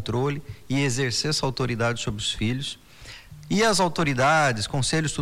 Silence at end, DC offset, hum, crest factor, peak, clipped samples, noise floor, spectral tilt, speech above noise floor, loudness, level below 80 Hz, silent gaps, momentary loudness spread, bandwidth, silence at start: 0 s; under 0.1%; none; 14 dB; -10 dBFS; under 0.1%; -44 dBFS; -4 dB/octave; 20 dB; -24 LUFS; -46 dBFS; none; 16 LU; 16 kHz; 0 s